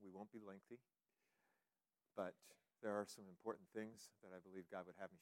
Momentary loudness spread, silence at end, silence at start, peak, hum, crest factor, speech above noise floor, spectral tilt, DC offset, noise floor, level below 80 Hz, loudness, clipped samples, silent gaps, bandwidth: 14 LU; 0 s; 0 s; -32 dBFS; none; 22 dB; over 37 dB; -5 dB/octave; under 0.1%; under -90 dBFS; under -90 dBFS; -54 LUFS; under 0.1%; none; 16 kHz